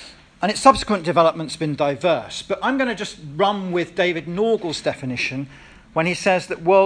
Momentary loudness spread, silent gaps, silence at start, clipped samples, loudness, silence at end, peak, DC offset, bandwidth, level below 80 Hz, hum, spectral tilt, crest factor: 10 LU; none; 0 s; under 0.1%; -21 LUFS; 0 s; 0 dBFS; under 0.1%; 10.5 kHz; -50 dBFS; none; -5 dB/octave; 20 dB